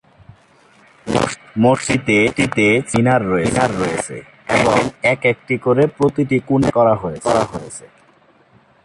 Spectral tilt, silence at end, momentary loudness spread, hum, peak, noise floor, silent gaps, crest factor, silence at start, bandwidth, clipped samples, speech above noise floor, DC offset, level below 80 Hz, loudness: -5.5 dB/octave; 1 s; 10 LU; none; -2 dBFS; -52 dBFS; none; 16 dB; 1.05 s; 11.5 kHz; under 0.1%; 36 dB; under 0.1%; -46 dBFS; -16 LUFS